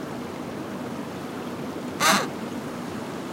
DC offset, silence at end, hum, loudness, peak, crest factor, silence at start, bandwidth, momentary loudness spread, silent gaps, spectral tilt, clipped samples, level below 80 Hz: under 0.1%; 0 s; none; -28 LUFS; -6 dBFS; 22 dB; 0 s; 16 kHz; 13 LU; none; -3 dB/octave; under 0.1%; -64 dBFS